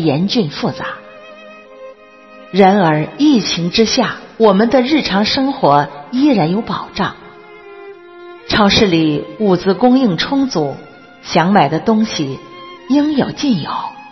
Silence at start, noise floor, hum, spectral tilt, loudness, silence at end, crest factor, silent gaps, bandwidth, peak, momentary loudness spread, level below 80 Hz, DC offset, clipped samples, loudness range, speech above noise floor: 0 s; -40 dBFS; none; -5.5 dB/octave; -14 LUFS; 0.05 s; 14 dB; none; 6.2 kHz; 0 dBFS; 13 LU; -44 dBFS; 0.1%; under 0.1%; 4 LU; 27 dB